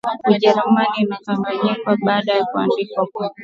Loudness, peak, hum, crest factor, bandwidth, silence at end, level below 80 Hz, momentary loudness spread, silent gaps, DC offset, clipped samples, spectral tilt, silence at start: -18 LUFS; 0 dBFS; none; 18 dB; 7.2 kHz; 0 s; -66 dBFS; 8 LU; none; under 0.1%; under 0.1%; -7 dB/octave; 0.05 s